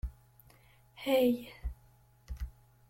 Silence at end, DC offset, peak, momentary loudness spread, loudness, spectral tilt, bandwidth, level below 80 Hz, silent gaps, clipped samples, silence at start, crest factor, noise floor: 0.4 s; under 0.1%; -16 dBFS; 19 LU; -33 LUFS; -6 dB/octave; 16.5 kHz; -46 dBFS; none; under 0.1%; 0.05 s; 20 dB; -63 dBFS